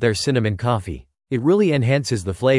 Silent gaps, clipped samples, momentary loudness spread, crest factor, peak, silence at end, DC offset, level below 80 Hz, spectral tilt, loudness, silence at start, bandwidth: none; under 0.1%; 10 LU; 16 dB; -4 dBFS; 0 s; under 0.1%; -48 dBFS; -6 dB/octave; -20 LUFS; 0 s; 12 kHz